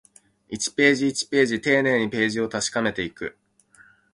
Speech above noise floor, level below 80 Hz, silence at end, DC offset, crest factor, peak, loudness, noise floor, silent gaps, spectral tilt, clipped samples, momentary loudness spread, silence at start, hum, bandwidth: 33 dB; -60 dBFS; 0.8 s; under 0.1%; 20 dB; -4 dBFS; -22 LUFS; -56 dBFS; none; -3.5 dB/octave; under 0.1%; 12 LU; 0.5 s; none; 11.5 kHz